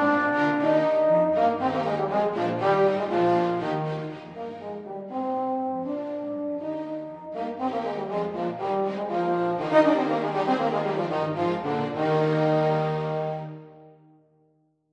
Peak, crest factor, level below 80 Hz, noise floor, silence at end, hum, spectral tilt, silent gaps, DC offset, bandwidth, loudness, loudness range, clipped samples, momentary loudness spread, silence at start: -6 dBFS; 18 dB; -68 dBFS; -66 dBFS; 1.05 s; none; -7.5 dB/octave; none; under 0.1%; 9.2 kHz; -25 LUFS; 7 LU; under 0.1%; 13 LU; 0 s